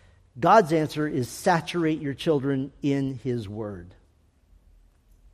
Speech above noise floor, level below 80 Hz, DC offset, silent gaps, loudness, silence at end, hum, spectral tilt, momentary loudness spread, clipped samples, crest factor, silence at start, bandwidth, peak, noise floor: 37 dB; -58 dBFS; under 0.1%; none; -25 LUFS; 1.45 s; none; -6 dB/octave; 14 LU; under 0.1%; 22 dB; 0.35 s; 14.5 kHz; -4 dBFS; -61 dBFS